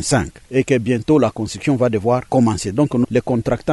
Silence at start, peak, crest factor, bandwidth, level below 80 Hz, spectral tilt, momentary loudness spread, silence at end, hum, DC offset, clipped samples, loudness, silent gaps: 0 s; -4 dBFS; 14 dB; 12 kHz; -42 dBFS; -6 dB/octave; 4 LU; 0 s; none; under 0.1%; under 0.1%; -18 LUFS; none